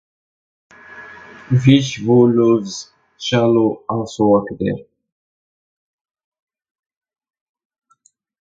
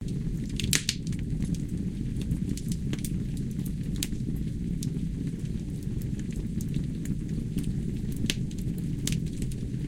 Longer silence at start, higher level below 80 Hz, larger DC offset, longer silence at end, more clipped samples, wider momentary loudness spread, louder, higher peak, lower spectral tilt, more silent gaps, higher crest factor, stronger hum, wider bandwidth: first, 0.9 s vs 0 s; second, -54 dBFS vs -38 dBFS; neither; first, 3.6 s vs 0 s; neither; first, 19 LU vs 3 LU; first, -16 LUFS vs -32 LUFS; first, 0 dBFS vs -4 dBFS; first, -6.5 dB/octave vs -5 dB/octave; neither; second, 20 dB vs 26 dB; neither; second, 7.8 kHz vs 17 kHz